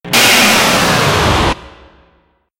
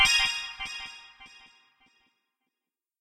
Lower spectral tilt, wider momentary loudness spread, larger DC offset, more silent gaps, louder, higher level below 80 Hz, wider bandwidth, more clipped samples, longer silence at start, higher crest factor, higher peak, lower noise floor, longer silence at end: first, -2.5 dB/octave vs 2 dB/octave; second, 9 LU vs 27 LU; neither; neither; first, -9 LUFS vs -27 LUFS; first, -30 dBFS vs -56 dBFS; first, over 20 kHz vs 16 kHz; neither; about the same, 0.05 s vs 0 s; second, 12 dB vs 24 dB; first, 0 dBFS vs -8 dBFS; second, -55 dBFS vs -90 dBFS; second, 0.9 s vs 1.75 s